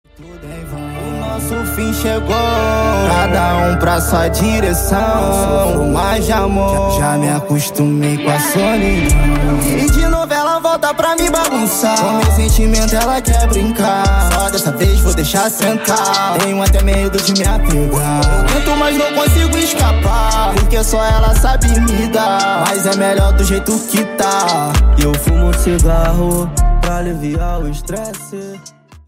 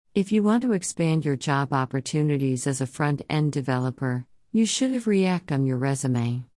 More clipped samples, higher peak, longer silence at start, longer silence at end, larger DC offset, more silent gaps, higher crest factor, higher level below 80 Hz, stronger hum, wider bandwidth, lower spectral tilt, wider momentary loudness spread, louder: neither; first, -2 dBFS vs -10 dBFS; about the same, 0.2 s vs 0.15 s; about the same, 0.1 s vs 0.1 s; neither; neither; about the same, 12 dB vs 14 dB; first, -16 dBFS vs -64 dBFS; neither; first, 16.5 kHz vs 12 kHz; second, -4.5 dB/octave vs -6 dB/octave; about the same, 6 LU vs 5 LU; first, -14 LUFS vs -25 LUFS